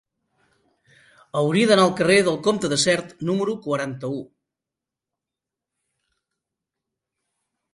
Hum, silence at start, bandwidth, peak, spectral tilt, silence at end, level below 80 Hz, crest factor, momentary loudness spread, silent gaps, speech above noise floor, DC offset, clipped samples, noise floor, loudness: none; 1.35 s; 11.5 kHz; -4 dBFS; -4.5 dB/octave; 3.5 s; -64 dBFS; 22 dB; 13 LU; none; 67 dB; under 0.1%; under 0.1%; -87 dBFS; -21 LUFS